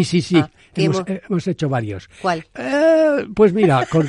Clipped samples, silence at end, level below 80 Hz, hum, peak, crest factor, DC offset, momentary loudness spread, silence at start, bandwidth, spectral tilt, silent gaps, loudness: under 0.1%; 0 s; -50 dBFS; none; -2 dBFS; 16 dB; under 0.1%; 10 LU; 0 s; 11 kHz; -6.5 dB/octave; none; -18 LUFS